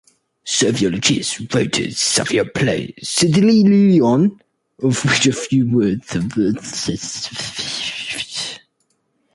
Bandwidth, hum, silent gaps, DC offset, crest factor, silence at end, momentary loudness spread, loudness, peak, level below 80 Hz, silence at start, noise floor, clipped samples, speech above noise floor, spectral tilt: 11.5 kHz; none; none; under 0.1%; 16 dB; 0.75 s; 12 LU; -17 LUFS; -2 dBFS; -50 dBFS; 0.45 s; -67 dBFS; under 0.1%; 50 dB; -4.5 dB/octave